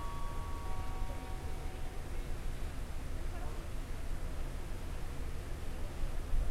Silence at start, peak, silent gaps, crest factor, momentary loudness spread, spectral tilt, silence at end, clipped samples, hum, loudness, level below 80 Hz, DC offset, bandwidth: 0 s; -22 dBFS; none; 16 dB; 2 LU; -5.5 dB/octave; 0 s; under 0.1%; none; -44 LUFS; -38 dBFS; under 0.1%; 14.5 kHz